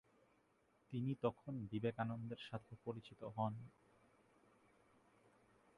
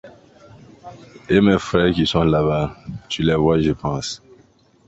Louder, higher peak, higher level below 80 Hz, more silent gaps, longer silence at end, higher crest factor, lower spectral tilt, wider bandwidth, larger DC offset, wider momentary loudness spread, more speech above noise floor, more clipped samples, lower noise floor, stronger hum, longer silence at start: second, -46 LUFS vs -19 LUFS; second, -24 dBFS vs -2 dBFS; second, -78 dBFS vs -40 dBFS; neither; first, 2.05 s vs 0.7 s; first, 24 dB vs 18 dB; first, -8.5 dB/octave vs -6 dB/octave; first, 11 kHz vs 8.2 kHz; neither; second, 9 LU vs 12 LU; second, 32 dB vs 36 dB; neither; first, -77 dBFS vs -54 dBFS; neither; first, 0.9 s vs 0.05 s